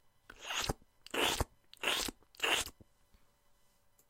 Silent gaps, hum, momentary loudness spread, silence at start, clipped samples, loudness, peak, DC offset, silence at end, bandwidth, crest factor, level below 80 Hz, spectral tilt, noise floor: none; none; 11 LU; 0.3 s; under 0.1%; -36 LUFS; -16 dBFS; under 0.1%; 1.4 s; 16 kHz; 24 dB; -54 dBFS; -1.5 dB/octave; -69 dBFS